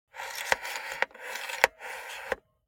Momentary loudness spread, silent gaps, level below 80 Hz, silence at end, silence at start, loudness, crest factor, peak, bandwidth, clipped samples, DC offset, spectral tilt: 12 LU; none; -64 dBFS; 0.3 s; 0.15 s; -31 LUFS; 34 dB; 0 dBFS; 17 kHz; under 0.1%; under 0.1%; 0 dB/octave